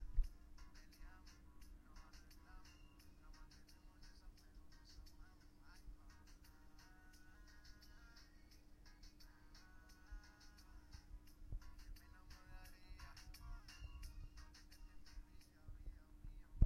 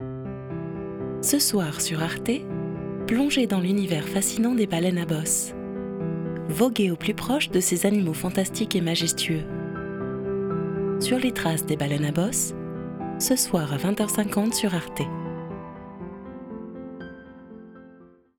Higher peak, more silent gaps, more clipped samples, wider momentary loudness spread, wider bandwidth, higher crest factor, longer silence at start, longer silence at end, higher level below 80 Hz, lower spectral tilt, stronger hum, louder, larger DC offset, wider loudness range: second, -20 dBFS vs -6 dBFS; neither; neither; second, 9 LU vs 16 LU; second, 15.5 kHz vs over 20 kHz; first, 32 dB vs 18 dB; about the same, 0 s vs 0 s; second, 0 s vs 0.3 s; about the same, -56 dBFS vs -52 dBFS; about the same, -5 dB/octave vs -4.5 dB/octave; neither; second, -62 LUFS vs -25 LUFS; neither; about the same, 6 LU vs 4 LU